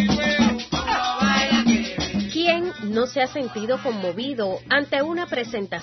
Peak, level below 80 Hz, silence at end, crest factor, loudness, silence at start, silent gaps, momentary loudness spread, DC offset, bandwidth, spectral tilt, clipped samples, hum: -6 dBFS; -46 dBFS; 0 s; 16 dB; -22 LUFS; 0 s; none; 8 LU; under 0.1%; 6.2 kHz; -4.5 dB/octave; under 0.1%; none